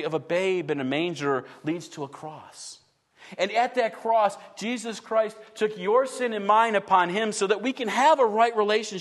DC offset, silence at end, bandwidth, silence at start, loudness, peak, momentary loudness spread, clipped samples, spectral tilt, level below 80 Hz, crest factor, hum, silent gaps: under 0.1%; 0 s; 12.5 kHz; 0 s; -25 LUFS; -8 dBFS; 16 LU; under 0.1%; -4 dB/octave; -78 dBFS; 18 dB; none; none